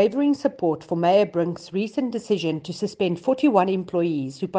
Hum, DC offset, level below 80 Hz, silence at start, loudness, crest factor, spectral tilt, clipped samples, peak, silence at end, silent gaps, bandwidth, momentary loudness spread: none; under 0.1%; -66 dBFS; 0 s; -23 LUFS; 18 dB; -7 dB/octave; under 0.1%; -4 dBFS; 0 s; none; 9.2 kHz; 8 LU